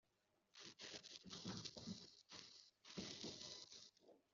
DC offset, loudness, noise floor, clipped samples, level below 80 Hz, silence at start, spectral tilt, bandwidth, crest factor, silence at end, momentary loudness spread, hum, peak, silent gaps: under 0.1%; -55 LUFS; -85 dBFS; under 0.1%; -84 dBFS; 0.55 s; -3 dB/octave; 7.4 kHz; 22 dB; 0.15 s; 10 LU; none; -36 dBFS; none